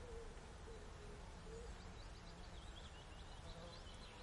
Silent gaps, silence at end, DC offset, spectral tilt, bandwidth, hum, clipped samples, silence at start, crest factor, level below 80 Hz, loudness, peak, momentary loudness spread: none; 0 s; under 0.1%; -4.5 dB/octave; 11.5 kHz; none; under 0.1%; 0 s; 12 dB; -58 dBFS; -56 LUFS; -42 dBFS; 2 LU